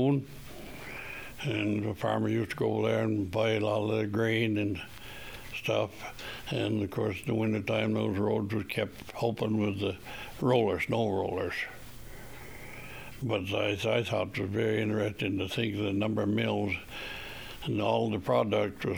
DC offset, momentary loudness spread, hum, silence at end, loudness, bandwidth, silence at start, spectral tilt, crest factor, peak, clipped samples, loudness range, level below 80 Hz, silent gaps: under 0.1%; 15 LU; none; 0 s; -31 LUFS; over 20 kHz; 0 s; -6.5 dB/octave; 18 dB; -12 dBFS; under 0.1%; 3 LU; -56 dBFS; none